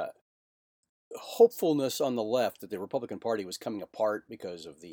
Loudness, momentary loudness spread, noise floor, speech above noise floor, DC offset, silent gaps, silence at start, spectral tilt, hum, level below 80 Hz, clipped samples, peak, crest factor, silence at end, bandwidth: -30 LUFS; 18 LU; under -90 dBFS; over 60 dB; under 0.1%; 0.21-0.83 s, 0.89-1.11 s; 0 s; -4.5 dB/octave; none; -80 dBFS; under 0.1%; -10 dBFS; 22 dB; 0 s; 19.5 kHz